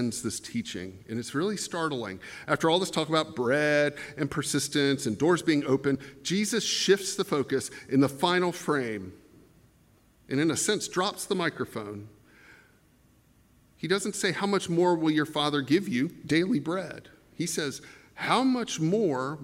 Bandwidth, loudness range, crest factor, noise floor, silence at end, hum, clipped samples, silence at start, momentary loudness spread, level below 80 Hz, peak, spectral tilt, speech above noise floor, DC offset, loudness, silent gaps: 16 kHz; 5 LU; 20 dB; -62 dBFS; 0 s; none; under 0.1%; 0 s; 11 LU; -66 dBFS; -8 dBFS; -4 dB/octave; 34 dB; under 0.1%; -28 LUFS; none